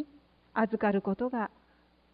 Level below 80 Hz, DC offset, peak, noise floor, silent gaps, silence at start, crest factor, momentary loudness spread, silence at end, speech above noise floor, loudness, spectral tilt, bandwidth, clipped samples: -66 dBFS; under 0.1%; -14 dBFS; -65 dBFS; none; 0 s; 18 dB; 10 LU; 0.65 s; 35 dB; -31 LUFS; -11 dB/octave; 4.9 kHz; under 0.1%